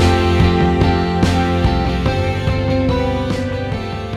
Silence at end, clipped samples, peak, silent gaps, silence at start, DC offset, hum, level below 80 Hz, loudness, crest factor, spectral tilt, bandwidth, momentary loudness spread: 0 s; under 0.1%; -2 dBFS; none; 0 s; under 0.1%; none; -24 dBFS; -16 LUFS; 14 dB; -7 dB/octave; 12 kHz; 7 LU